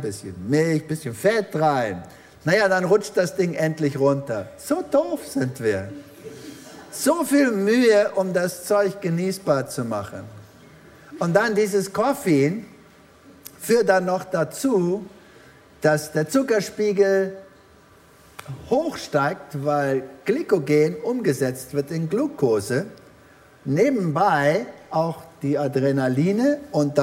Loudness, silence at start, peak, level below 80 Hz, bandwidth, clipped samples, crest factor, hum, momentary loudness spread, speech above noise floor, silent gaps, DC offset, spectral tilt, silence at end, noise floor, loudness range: -22 LUFS; 0 s; -2 dBFS; -62 dBFS; 16 kHz; under 0.1%; 20 dB; none; 14 LU; 30 dB; none; under 0.1%; -6 dB/octave; 0 s; -51 dBFS; 3 LU